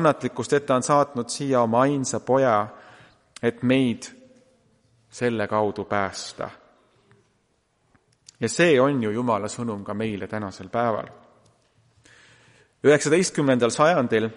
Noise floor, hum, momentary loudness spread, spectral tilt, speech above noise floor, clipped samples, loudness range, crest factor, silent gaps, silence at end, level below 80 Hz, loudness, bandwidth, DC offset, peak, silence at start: -68 dBFS; none; 12 LU; -5 dB/octave; 46 dB; under 0.1%; 7 LU; 18 dB; none; 0 s; -64 dBFS; -23 LUFS; 11.5 kHz; under 0.1%; -6 dBFS; 0 s